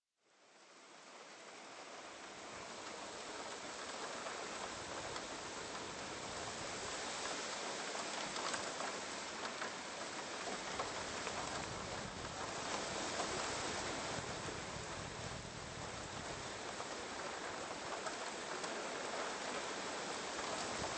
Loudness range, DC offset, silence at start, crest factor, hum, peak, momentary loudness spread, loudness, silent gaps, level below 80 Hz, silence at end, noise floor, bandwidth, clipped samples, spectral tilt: 5 LU; under 0.1%; 0.4 s; 18 dB; none; -26 dBFS; 8 LU; -44 LUFS; none; -66 dBFS; 0 s; -72 dBFS; 8.8 kHz; under 0.1%; -2 dB/octave